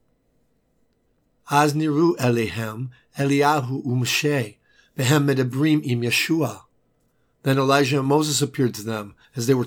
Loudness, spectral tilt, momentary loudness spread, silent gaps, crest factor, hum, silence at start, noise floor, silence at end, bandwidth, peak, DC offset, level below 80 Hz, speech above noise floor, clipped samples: -21 LUFS; -5 dB/octave; 12 LU; none; 18 dB; none; 1.45 s; -66 dBFS; 0 s; 19 kHz; -4 dBFS; under 0.1%; -64 dBFS; 45 dB; under 0.1%